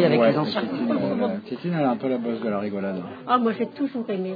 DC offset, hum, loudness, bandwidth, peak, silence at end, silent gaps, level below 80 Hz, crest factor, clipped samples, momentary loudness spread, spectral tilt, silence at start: under 0.1%; none; -24 LUFS; 5 kHz; -6 dBFS; 0 s; none; -76 dBFS; 18 dB; under 0.1%; 8 LU; -9 dB/octave; 0 s